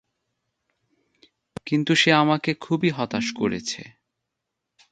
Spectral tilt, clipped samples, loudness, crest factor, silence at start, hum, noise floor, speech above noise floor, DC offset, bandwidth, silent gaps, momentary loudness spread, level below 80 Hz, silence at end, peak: -4.5 dB/octave; under 0.1%; -22 LUFS; 24 dB; 1.65 s; none; -82 dBFS; 60 dB; under 0.1%; 9.2 kHz; none; 16 LU; -64 dBFS; 1.05 s; -2 dBFS